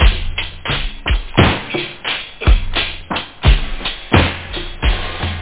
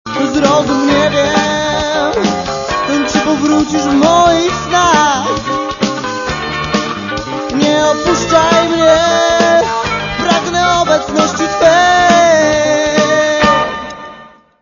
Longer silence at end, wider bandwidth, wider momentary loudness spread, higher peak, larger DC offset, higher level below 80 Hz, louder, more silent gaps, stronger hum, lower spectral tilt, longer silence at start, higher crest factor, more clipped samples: second, 0 s vs 0.35 s; second, 4 kHz vs 7.4 kHz; about the same, 9 LU vs 9 LU; about the same, 0 dBFS vs 0 dBFS; first, 0.8% vs under 0.1%; first, -18 dBFS vs -36 dBFS; second, -18 LUFS vs -11 LUFS; neither; neither; first, -9.5 dB/octave vs -3.5 dB/octave; about the same, 0 s vs 0.05 s; about the same, 16 dB vs 12 dB; neither